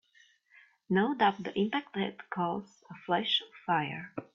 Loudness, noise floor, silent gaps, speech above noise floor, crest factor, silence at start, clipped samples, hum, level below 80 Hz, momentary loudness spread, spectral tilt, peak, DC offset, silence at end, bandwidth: -31 LUFS; -65 dBFS; none; 33 dB; 20 dB; 0.9 s; under 0.1%; none; -74 dBFS; 11 LU; -6.5 dB/octave; -12 dBFS; under 0.1%; 0.1 s; 7.4 kHz